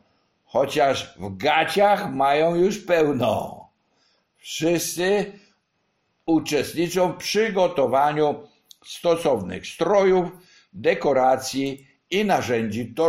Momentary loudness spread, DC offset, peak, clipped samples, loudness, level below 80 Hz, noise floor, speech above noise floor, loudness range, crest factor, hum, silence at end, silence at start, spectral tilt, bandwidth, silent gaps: 10 LU; under 0.1%; -6 dBFS; under 0.1%; -22 LUFS; -56 dBFS; -71 dBFS; 50 dB; 4 LU; 18 dB; none; 0 s; 0.55 s; -4.5 dB/octave; 16 kHz; none